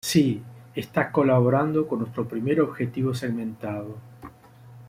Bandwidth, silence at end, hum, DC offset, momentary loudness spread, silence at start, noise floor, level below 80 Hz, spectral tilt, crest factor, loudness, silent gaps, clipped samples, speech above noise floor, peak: 16 kHz; 0 s; none; under 0.1%; 15 LU; 0.05 s; -48 dBFS; -60 dBFS; -6.5 dB/octave; 18 dB; -25 LUFS; none; under 0.1%; 24 dB; -6 dBFS